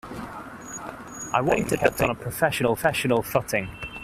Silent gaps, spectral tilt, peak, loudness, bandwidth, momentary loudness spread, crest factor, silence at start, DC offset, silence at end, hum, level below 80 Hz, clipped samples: none; -4.5 dB/octave; -4 dBFS; -24 LUFS; 16 kHz; 15 LU; 22 dB; 0.05 s; under 0.1%; 0 s; none; -48 dBFS; under 0.1%